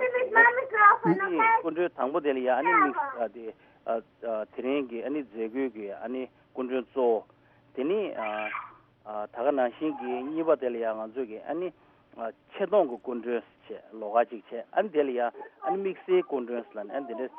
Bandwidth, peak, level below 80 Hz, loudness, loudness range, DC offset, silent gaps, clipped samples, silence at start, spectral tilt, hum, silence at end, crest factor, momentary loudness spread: 4.3 kHz; -6 dBFS; -76 dBFS; -28 LUFS; 8 LU; under 0.1%; none; under 0.1%; 0 s; -3.5 dB/octave; none; 0 s; 22 dB; 16 LU